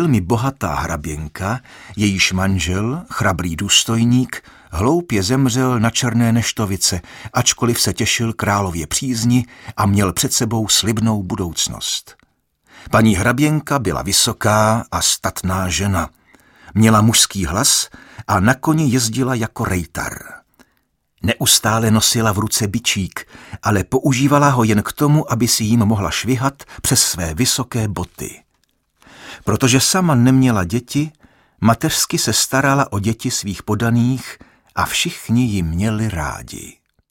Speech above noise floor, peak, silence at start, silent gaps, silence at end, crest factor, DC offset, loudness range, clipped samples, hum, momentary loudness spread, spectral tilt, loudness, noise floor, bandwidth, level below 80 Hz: 48 dB; 0 dBFS; 0 s; none; 0.4 s; 18 dB; under 0.1%; 4 LU; under 0.1%; none; 11 LU; -4 dB/octave; -16 LUFS; -65 dBFS; 17 kHz; -40 dBFS